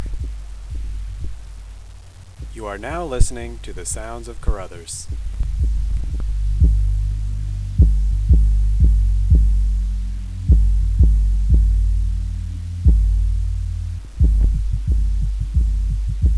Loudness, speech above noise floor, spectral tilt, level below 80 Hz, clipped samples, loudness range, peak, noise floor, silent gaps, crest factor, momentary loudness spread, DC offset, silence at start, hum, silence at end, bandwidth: -21 LUFS; 17 dB; -6.5 dB/octave; -18 dBFS; under 0.1%; 10 LU; 0 dBFS; -39 dBFS; none; 18 dB; 15 LU; 0.4%; 0 s; none; 0 s; 10.5 kHz